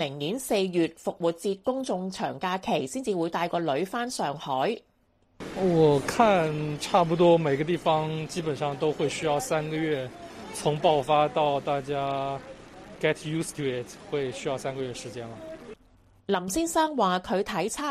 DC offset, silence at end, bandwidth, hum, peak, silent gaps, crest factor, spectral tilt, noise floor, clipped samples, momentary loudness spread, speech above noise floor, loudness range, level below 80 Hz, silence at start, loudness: under 0.1%; 0 s; 15 kHz; none; -8 dBFS; none; 20 dB; -5 dB/octave; -65 dBFS; under 0.1%; 16 LU; 39 dB; 8 LU; -58 dBFS; 0 s; -27 LUFS